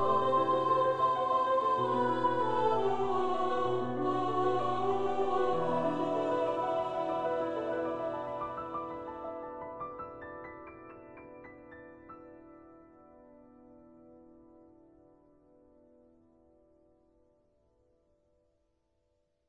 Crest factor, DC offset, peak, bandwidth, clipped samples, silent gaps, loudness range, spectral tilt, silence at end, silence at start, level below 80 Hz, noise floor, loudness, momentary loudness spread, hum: 16 dB; under 0.1%; -16 dBFS; 9.6 kHz; under 0.1%; none; 22 LU; -7 dB/octave; 0 s; 0 s; -68 dBFS; -77 dBFS; -32 LUFS; 22 LU; none